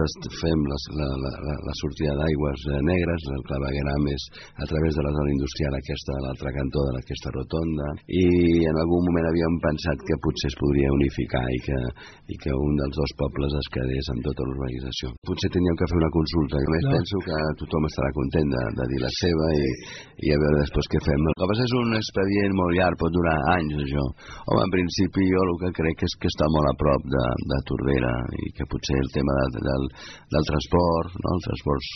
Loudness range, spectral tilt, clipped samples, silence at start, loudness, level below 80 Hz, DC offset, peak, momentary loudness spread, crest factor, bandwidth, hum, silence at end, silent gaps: 4 LU; -6 dB/octave; under 0.1%; 0 s; -25 LUFS; -36 dBFS; under 0.1%; -6 dBFS; 9 LU; 18 dB; 6.4 kHz; none; 0 s; 15.18-15.22 s